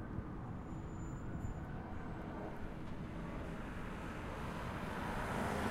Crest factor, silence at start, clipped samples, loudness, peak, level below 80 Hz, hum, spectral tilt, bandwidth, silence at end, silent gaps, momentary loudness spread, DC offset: 18 dB; 0 s; under 0.1%; -45 LUFS; -26 dBFS; -50 dBFS; none; -6.5 dB/octave; 16 kHz; 0 s; none; 7 LU; under 0.1%